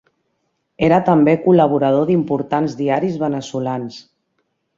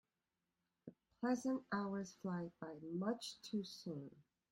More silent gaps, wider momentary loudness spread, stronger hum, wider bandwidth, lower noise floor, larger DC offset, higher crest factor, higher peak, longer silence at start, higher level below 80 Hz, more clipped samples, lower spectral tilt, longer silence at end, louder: neither; second, 10 LU vs 20 LU; neither; second, 7.6 kHz vs 16 kHz; second, -70 dBFS vs under -90 dBFS; neither; about the same, 16 dB vs 18 dB; first, -2 dBFS vs -28 dBFS; about the same, 0.8 s vs 0.85 s; first, -54 dBFS vs -82 dBFS; neither; first, -8 dB/octave vs -5.5 dB/octave; first, 0.75 s vs 0.3 s; first, -16 LUFS vs -45 LUFS